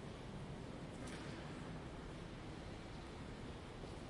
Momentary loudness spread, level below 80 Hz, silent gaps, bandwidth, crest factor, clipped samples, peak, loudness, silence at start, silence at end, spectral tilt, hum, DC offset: 2 LU; -58 dBFS; none; 11.5 kHz; 14 dB; under 0.1%; -36 dBFS; -51 LUFS; 0 s; 0 s; -6 dB/octave; none; under 0.1%